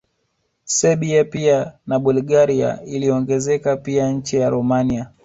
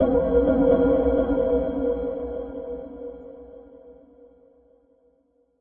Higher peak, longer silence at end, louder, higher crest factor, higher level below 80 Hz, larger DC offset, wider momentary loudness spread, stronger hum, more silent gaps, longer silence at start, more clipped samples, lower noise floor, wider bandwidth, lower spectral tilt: first, -4 dBFS vs -8 dBFS; second, 0.15 s vs 1.7 s; first, -18 LUFS vs -23 LUFS; about the same, 16 dB vs 16 dB; second, -50 dBFS vs -40 dBFS; neither; second, 5 LU vs 22 LU; neither; neither; first, 0.65 s vs 0 s; neither; first, -69 dBFS vs -65 dBFS; first, 8 kHz vs 3.6 kHz; second, -5.5 dB/octave vs -12 dB/octave